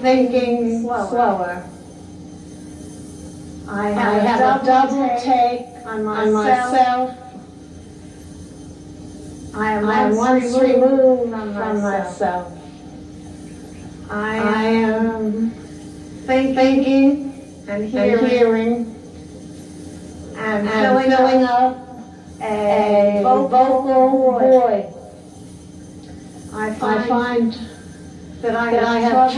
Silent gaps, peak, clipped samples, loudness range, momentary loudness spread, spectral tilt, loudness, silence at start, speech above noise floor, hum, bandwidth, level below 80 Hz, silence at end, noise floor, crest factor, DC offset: none; -2 dBFS; under 0.1%; 8 LU; 23 LU; -6 dB/octave; -17 LUFS; 0 s; 22 dB; none; 11.5 kHz; -52 dBFS; 0 s; -38 dBFS; 16 dB; under 0.1%